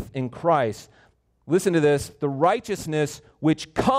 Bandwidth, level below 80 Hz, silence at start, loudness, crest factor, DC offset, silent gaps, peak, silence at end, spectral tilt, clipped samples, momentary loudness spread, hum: 16 kHz; -52 dBFS; 0 s; -23 LUFS; 16 dB; under 0.1%; none; -8 dBFS; 0 s; -6 dB/octave; under 0.1%; 8 LU; none